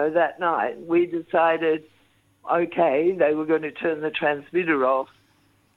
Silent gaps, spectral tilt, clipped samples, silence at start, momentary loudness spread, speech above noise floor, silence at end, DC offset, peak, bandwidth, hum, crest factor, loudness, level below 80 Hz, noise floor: none; -7.5 dB/octave; under 0.1%; 0 s; 6 LU; 40 dB; 0.7 s; under 0.1%; -6 dBFS; 4.2 kHz; none; 16 dB; -23 LUFS; -70 dBFS; -62 dBFS